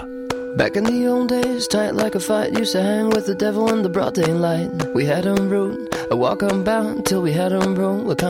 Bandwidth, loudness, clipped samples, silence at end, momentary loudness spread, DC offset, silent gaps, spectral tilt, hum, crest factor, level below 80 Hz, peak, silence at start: 16.5 kHz; -20 LUFS; under 0.1%; 0 s; 3 LU; under 0.1%; none; -5.5 dB/octave; none; 14 dB; -50 dBFS; -6 dBFS; 0 s